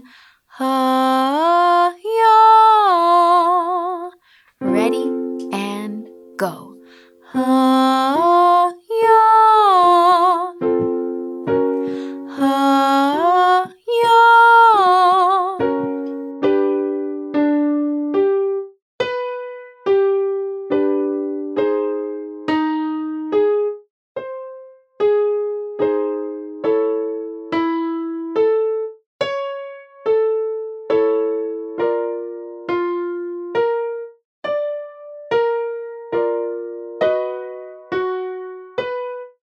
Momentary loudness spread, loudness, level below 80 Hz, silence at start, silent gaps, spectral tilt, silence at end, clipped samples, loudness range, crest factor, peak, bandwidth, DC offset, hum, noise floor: 17 LU; -17 LUFS; -68 dBFS; 0.55 s; 18.82-18.99 s, 23.90-24.15 s, 29.06-29.19 s, 34.25-34.42 s; -5 dB/octave; 0.25 s; under 0.1%; 10 LU; 14 dB; -2 dBFS; 14 kHz; under 0.1%; none; -53 dBFS